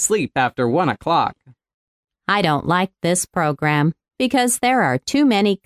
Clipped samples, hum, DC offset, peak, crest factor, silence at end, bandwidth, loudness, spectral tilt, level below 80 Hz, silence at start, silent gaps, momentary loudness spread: under 0.1%; none; under 0.1%; -4 dBFS; 16 dB; 0.1 s; 16 kHz; -18 LUFS; -4 dB/octave; -54 dBFS; 0 s; 1.74-2.03 s; 5 LU